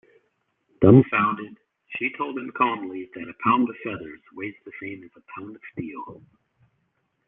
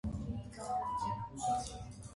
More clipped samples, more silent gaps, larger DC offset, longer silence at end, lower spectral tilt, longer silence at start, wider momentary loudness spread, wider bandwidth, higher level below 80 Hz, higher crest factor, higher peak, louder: neither; neither; neither; first, 1.15 s vs 0 s; first, -11 dB/octave vs -5.5 dB/octave; first, 0.8 s vs 0.05 s; first, 24 LU vs 7 LU; second, 3.8 kHz vs 11.5 kHz; second, -58 dBFS vs -52 dBFS; first, 24 dB vs 14 dB; first, -2 dBFS vs -24 dBFS; first, -22 LUFS vs -39 LUFS